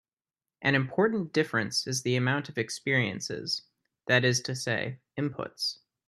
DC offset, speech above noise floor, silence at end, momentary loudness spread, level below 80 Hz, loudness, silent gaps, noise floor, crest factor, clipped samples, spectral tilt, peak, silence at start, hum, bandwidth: under 0.1%; over 61 dB; 0.35 s; 9 LU; -70 dBFS; -29 LUFS; none; under -90 dBFS; 22 dB; under 0.1%; -4 dB/octave; -8 dBFS; 0.6 s; none; 13 kHz